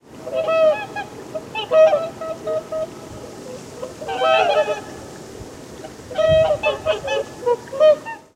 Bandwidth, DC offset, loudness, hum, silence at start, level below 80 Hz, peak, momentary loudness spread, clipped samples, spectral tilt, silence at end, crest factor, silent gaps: 12.5 kHz; under 0.1%; -19 LUFS; none; 0.1 s; -50 dBFS; -4 dBFS; 20 LU; under 0.1%; -4 dB/octave; 0.2 s; 16 dB; none